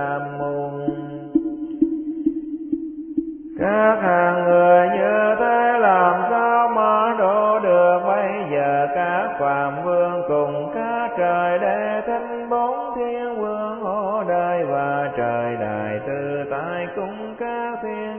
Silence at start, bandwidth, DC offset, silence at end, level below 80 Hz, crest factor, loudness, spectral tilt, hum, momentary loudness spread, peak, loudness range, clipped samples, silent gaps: 0 s; 3.4 kHz; under 0.1%; 0 s; -58 dBFS; 16 dB; -20 LUFS; -10.5 dB/octave; none; 11 LU; -4 dBFS; 8 LU; under 0.1%; none